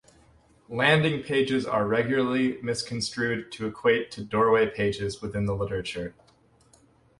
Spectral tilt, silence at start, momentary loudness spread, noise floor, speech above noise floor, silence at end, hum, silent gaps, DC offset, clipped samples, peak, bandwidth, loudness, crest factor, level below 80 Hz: -5.5 dB/octave; 0.7 s; 10 LU; -61 dBFS; 35 dB; 1.1 s; none; none; under 0.1%; under 0.1%; -6 dBFS; 11.5 kHz; -26 LUFS; 20 dB; -54 dBFS